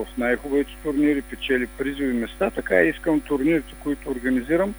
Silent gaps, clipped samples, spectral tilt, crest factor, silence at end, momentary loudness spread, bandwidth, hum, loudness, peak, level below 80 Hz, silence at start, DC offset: none; under 0.1%; -6 dB/octave; 20 dB; 0 s; 7 LU; over 20 kHz; none; -23 LUFS; -4 dBFS; -42 dBFS; 0 s; under 0.1%